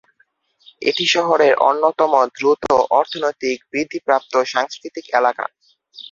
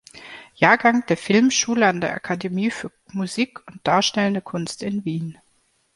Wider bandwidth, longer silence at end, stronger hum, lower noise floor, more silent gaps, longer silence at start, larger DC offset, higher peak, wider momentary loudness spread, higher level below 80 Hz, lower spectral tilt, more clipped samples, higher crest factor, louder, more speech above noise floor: second, 7.6 kHz vs 11.5 kHz; second, 0.05 s vs 0.65 s; neither; about the same, -62 dBFS vs -64 dBFS; neither; first, 0.8 s vs 0.15 s; neither; about the same, 0 dBFS vs -2 dBFS; second, 10 LU vs 15 LU; about the same, -60 dBFS vs -62 dBFS; about the same, -3 dB/octave vs -4 dB/octave; neither; about the same, 18 dB vs 20 dB; first, -17 LUFS vs -21 LUFS; about the same, 44 dB vs 44 dB